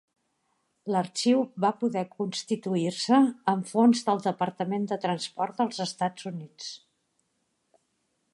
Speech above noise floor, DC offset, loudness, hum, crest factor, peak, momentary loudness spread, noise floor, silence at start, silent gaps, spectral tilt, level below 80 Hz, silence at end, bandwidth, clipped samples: 49 dB; under 0.1%; -27 LUFS; none; 18 dB; -10 dBFS; 16 LU; -76 dBFS; 0.85 s; none; -5 dB/octave; -80 dBFS; 1.6 s; 11.5 kHz; under 0.1%